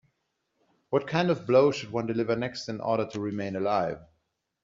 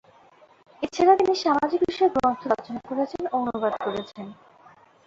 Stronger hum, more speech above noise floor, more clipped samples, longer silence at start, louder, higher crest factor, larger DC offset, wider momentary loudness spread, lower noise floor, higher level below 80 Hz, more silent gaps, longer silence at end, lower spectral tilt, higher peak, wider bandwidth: neither; first, 51 dB vs 31 dB; neither; about the same, 0.9 s vs 0.8 s; second, -28 LUFS vs -24 LUFS; about the same, 20 dB vs 20 dB; neither; second, 11 LU vs 14 LU; first, -78 dBFS vs -55 dBFS; second, -66 dBFS vs -60 dBFS; neither; second, 0.6 s vs 0.75 s; about the same, -5 dB/octave vs -5 dB/octave; second, -10 dBFS vs -6 dBFS; about the same, 7.6 kHz vs 7.6 kHz